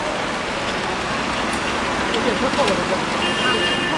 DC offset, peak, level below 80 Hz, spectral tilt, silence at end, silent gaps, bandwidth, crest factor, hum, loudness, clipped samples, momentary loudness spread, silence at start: under 0.1%; -6 dBFS; -42 dBFS; -3.5 dB/octave; 0 s; none; 11.5 kHz; 16 dB; none; -20 LUFS; under 0.1%; 5 LU; 0 s